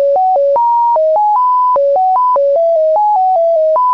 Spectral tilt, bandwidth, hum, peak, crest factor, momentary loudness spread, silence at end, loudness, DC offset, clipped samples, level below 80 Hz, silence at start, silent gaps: -5 dB/octave; 6 kHz; none; -8 dBFS; 2 dB; 0 LU; 0 s; -11 LUFS; 0.4%; under 0.1%; -66 dBFS; 0 s; none